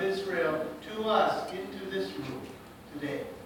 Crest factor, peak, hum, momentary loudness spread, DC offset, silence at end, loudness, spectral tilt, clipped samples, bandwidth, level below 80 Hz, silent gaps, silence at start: 20 dB; -12 dBFS; none; 16 LU; under 0.1%; 0 s; -32 LUFS; -5 dB/octave; under 0.1%; 18 kHz; -64 dBFS; none; 0 s